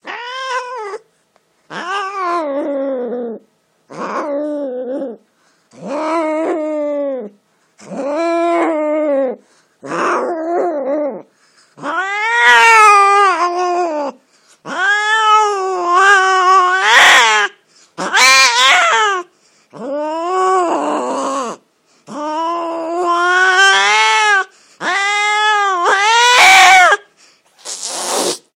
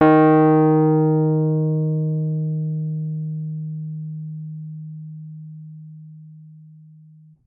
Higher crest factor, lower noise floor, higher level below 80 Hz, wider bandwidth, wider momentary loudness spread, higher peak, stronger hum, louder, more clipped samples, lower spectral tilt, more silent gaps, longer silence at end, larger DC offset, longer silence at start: about the same, 14 dB vs 16 dB; first, -58 dBFS vs -48 dBFS; about the same, -68 dBFS vs -66 dBFS; first, 20 kHz vs 3.9 kHz; second, 19 LU vs 23 LU; first, 0 dBFS vs -4 dBFS; neither; first, -12 LUFS vs -19 LUFS; first, 0.1% vs under 0.1%; second, -0.5 dB/octave vs -13 dB/octave; neither; second, 0.2 s vs 0.8 s; neither; about the same, 0.05 s vs 0 s